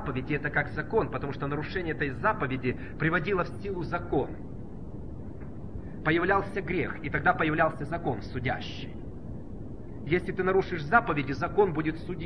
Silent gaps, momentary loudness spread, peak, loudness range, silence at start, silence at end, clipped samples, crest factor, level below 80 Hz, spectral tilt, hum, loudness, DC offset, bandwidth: none; 16 LU; -8 dBFS; 3 LU; 0 s; 0 s; under 0.1%; 22 dB; -46 dBFS; -8 dB/octave; none; -29 LUFS; 0.8%; 10 kHz